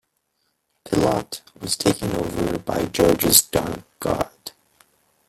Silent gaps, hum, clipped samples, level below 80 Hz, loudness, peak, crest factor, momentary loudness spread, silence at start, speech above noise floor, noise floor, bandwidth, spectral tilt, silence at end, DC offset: none; none; under 0.1%; -44 dBFS; -21 LUFS; 0 dBFS; 22 dB; 16 LU; 0.85 s; 50 dB; -72 dBFS; 16.5 kHz; -3.5 dB/octave; 0.8 s; under 0.1%